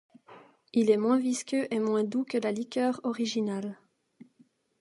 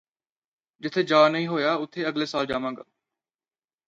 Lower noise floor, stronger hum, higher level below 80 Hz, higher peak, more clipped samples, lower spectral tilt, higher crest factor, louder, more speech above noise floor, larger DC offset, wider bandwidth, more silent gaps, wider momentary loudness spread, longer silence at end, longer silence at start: second, -65 dBFS vs under -90 dBFS; neither; second, -82 dBFS vs -64 dBFS; second, -12 dBFS vs -6 dBFS; neither; about the same, -5 dB/octave vs -5.5 dB/octave; about the same, 18 dB vs 20 dB; second, -29 LUFS vs -24 LUFS; second, 37 dB vs over 66 dB; neither; first, 11.5 kHz vs 7.8 kHz; neither; second, 7 LU vs 14 LU; about the same, 1.05 s vs 1.1 s; second, 0.3 s vs 0.8 s